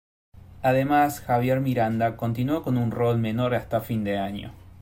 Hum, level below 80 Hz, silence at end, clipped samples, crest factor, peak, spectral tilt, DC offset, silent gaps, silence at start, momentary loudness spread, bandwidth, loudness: none; -52 dBFS; 0.1 s; under 0.1%; 16 dB; -8 dBFS; -7.5 dB/octave; under 0.1%; none; 0.35 s; 6 LU; 16.5 kHz; -24 LUFS